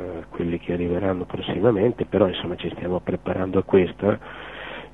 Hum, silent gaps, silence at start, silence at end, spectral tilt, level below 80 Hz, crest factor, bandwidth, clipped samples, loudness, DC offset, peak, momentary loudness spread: none; none; 0 s; 0.05 s; -9 dB/octave; -48 dBFS; 20 dB; 4 kHz; under 0.1%; -23 LUFS; 0.2%; -4 dBFS; 12 LU